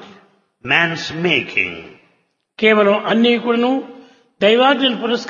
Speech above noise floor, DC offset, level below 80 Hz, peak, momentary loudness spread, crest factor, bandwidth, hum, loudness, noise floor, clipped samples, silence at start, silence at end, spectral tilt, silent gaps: 47 dB; under 0.1%; -62 dBFS; 0 dBFS; 10 LU; 18 dB; 7.2 kHz; none; -15 LUFS; -63 dBFS; under 0.1%; 0 s; 0 s; -5 dB/octave; none